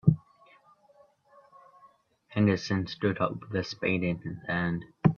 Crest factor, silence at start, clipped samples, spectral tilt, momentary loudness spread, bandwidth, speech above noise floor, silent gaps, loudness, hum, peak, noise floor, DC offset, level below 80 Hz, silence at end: 22 dB; 0.05 s; under 0.1%; -7.5 dB/octave; 8 LU; 6.8 kHz; 33 dB; none; -30 LUFS; none; -8 dBFS; -62 dBFS; under 0.1%; -60 dBFS; 0.05 s